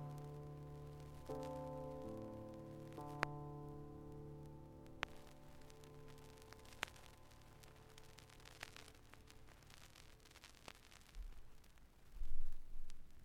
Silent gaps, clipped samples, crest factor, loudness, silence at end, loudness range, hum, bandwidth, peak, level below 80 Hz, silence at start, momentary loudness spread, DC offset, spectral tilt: none; under 0.1%; 30 dB; -54 LUFS; 0 s; 10 LU; none; 12.5 kHz; -16 dBFS; -54 dBFS; 0 s; 14 LU; under 0.1%; -5 dB/octave